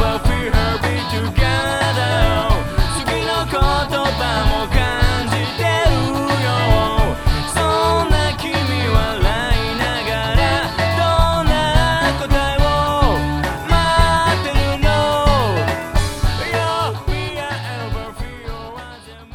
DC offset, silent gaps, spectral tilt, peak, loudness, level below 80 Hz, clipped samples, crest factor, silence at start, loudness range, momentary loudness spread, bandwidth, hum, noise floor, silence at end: under 0.1%; none; -5 dB/octave; 0 dBFS; -17 LUFS; -22 dBFS; under 0.1%; 16 dB; 0 s; 2 LU; 7 LU; 17.5 kHz; none; -37 dBFS; 0.1 s